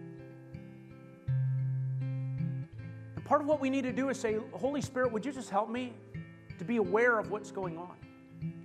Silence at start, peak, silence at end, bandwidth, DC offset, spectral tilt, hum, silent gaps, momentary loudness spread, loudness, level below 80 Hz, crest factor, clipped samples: 0 s; -14 dBFS; 0 s; 10 kHz; under 0.1%; -7 dB/octave; none; none; 20 LU; -33 LUFS; -66 dBFS; 20 dB; under 0.1%